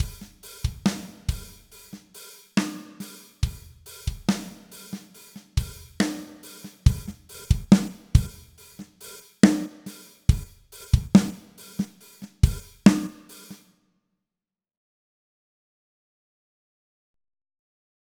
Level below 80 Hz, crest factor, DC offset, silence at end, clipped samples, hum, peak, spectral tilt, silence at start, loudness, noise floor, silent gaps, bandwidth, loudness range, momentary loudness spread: -34 dBFS; 26 dB; under 0.1%; 4.6 s; under 0.1%; none; 0 dBFS; -6 dB/octave; 0 s; -25 LUFS; under -90 dBFS; none; 19.5 kHz; 8 LU; 25 LU